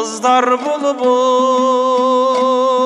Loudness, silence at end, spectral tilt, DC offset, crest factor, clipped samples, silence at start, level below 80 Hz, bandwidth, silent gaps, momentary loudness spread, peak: -14 LUFS; 0 s; -2.5 dB/octave; under 0.1%; 12 dB; under 0.1%; 0 s; -74 dBFS; 11 kHz; none; 3 LU; 0 dBFS